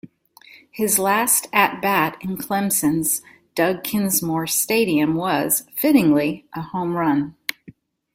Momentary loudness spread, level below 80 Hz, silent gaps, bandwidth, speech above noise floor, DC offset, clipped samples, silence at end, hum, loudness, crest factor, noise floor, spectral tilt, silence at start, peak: 12 LU; -60 dBFS; none; 16.5 kHz; 30 dB; under 0.1%; under 0.1%; 0.6 s; none; -20 LUFS; 20 dB; -49 dBFS; -3.5 dB/octave; 0.05 s; -2 dBFS